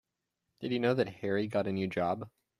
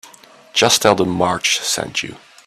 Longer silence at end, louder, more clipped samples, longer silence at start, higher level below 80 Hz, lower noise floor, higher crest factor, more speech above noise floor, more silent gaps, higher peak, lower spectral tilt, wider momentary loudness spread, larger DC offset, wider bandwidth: about the same, 0.3 s vs 0.3 s; second, -33 LUFS vs -16 LUFS; neither; first, 0.6 s vs 0.05 s; second, -70 dBFS vs -54 dBFS; first, -85 dBFS vs -44 dBFS; about the same, 18 dB vs 18 dB; first, 54 dB vs 28 dB; neither; second, -16 dBFS vs 0 dBFS; first, -7.5 dB/octave vs -2.5 dB/octave; second, 7 LU vs 11 LU; neither; second, 13 kHz vs 16 kHz